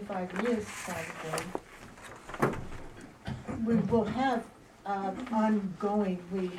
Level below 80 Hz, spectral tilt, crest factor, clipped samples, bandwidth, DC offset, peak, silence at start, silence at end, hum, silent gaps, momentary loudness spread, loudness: -54 dBFS; -6 dB/octave; 20 dB; under 0.1%; 15.5 kHz; under 0.1%; -12 dBFS; 0 s; 0 s; none; none; 18 LU; -32 LUFS